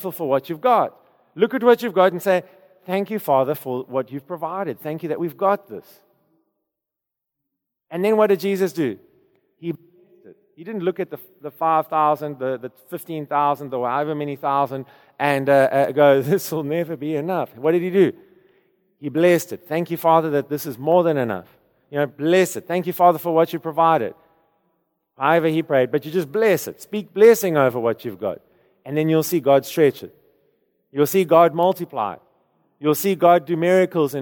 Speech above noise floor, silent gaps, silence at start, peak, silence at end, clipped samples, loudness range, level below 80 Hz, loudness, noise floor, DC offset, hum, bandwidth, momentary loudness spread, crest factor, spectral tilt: 65 dB; none; 0 s; -2 dBFS; 0 s; under 0.1%; 6 LU; -72 dBFS; -20 LUFS; -84 dBFS; under 0.1%; none; 19.5 kHz; 14 LU; 18 dB; -6 dB/octave